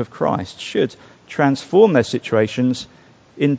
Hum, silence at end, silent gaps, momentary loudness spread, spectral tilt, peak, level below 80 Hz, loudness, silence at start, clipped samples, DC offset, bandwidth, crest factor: none; 0 s; none; 12 LU; -6.5 dB/octave; 0 dBFS; -54 dBFS; -18 LUFS; 0 s; under 0.1%; under 0.1%; 8 kHz; 18 dB